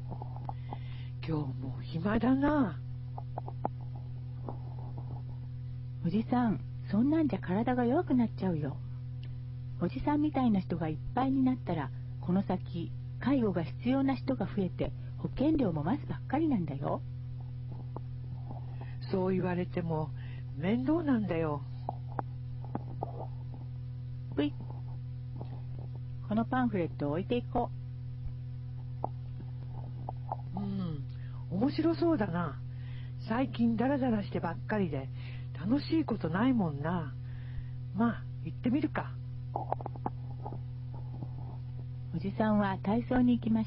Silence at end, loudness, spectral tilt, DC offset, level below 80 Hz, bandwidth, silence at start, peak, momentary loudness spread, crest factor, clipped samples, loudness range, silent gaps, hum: 0 s; -34 LUFS; -7.5 dB/octave; under 0.1%; -52 dBFS; 5.6 kHz; 0 s; -14 dBFS; 13 LU; 18 dB; under 0.1%; 7 LU; none; none